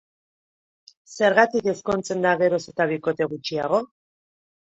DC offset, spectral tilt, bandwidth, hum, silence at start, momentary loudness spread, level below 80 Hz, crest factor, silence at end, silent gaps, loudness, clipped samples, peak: under 0.1%; -5 dB/octave; 8.2 kHz; none; 1.1 s; 8 LU; -62 dBFS; 22 dB; 0.85 s; none; -22 LUFS; under 0.1%; -2 dBFS